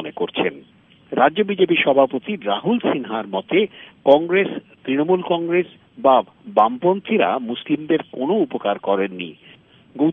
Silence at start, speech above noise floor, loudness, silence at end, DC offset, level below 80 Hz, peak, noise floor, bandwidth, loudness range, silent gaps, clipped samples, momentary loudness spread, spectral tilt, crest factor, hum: 0 s; 32 dB; -19 LUFS; 0 s; under 0.1%; -70 dBFS; 0 dBFS; -51 dBFS; 3.9 kHz; 2 LU; none; under 0.1%; 9 LU; -3.5 dB/octave; 18 dB; none